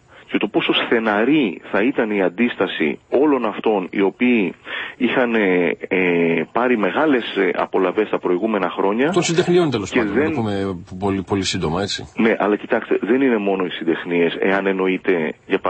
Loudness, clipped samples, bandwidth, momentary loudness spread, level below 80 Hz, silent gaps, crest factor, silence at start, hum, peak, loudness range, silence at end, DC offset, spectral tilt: -19 LUFS; under 0.1%; 8.8 kHz; 5 LU; -54 dBFS; none; 16 dB; 0.2 s; none; -2 dBFS; 2 LU; 0 s; under 0.1%; -5.5 dB/octave